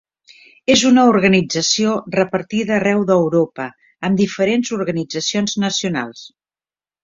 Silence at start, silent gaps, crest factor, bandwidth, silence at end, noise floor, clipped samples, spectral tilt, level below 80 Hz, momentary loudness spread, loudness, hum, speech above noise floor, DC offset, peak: 0.7 s; none; 16 dB; 7.8 kHz; 0.75 s; under -90 dBFS; under 0.1%; -4.5 dB/octave; -54 dBFS; 11 LU; -16 LUFS; none; over 74 dB; under 0.1%; -2 dBFS